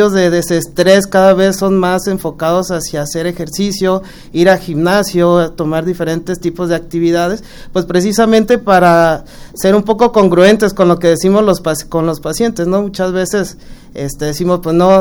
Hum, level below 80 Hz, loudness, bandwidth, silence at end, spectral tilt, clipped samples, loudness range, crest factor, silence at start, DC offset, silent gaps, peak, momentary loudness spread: none; -36 dBFS; -12 LUFS; over 20 kHz; 0 s; -5.5 dB/octave; 0.2%; 5 LU; 12 dB; 0 s; under 0.1%; none; 0 dBFS; 10 LU